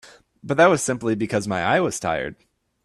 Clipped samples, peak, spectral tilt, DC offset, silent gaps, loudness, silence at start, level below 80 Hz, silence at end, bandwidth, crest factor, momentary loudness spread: under 0.1%; -4 dBFS; -4.5 dB/octave; under 0.1%; none; -21 LUFS; 0.05 s; -56 dBFS; 0.5 s; 13 kHz; 18 dB; 9 LU